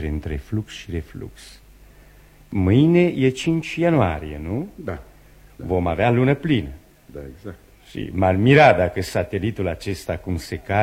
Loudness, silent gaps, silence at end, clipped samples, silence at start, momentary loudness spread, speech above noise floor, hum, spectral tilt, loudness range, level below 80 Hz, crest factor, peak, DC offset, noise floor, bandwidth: -20 LUFS; none; 0 s; under 0.1%; 0 s; 22 LU; 28 dB; none; -7 dB/octave; 5 LU; -40 dBFS; 20 dB; 0 dBFS; under 0.1%; -48 dBFS; 16 kHz